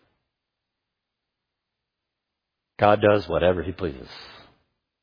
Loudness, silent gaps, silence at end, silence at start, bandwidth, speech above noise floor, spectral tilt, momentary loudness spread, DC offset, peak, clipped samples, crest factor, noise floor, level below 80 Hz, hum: -22 LUFS; none; 0.75 s; 2.8 s; 5.2 kHz; 62 dB; -8 dB/octave; 22 LU; under 0.1%; -4 dBFS; under 0.1%; 24 dB; -83 dBFS; -50 dBFS; none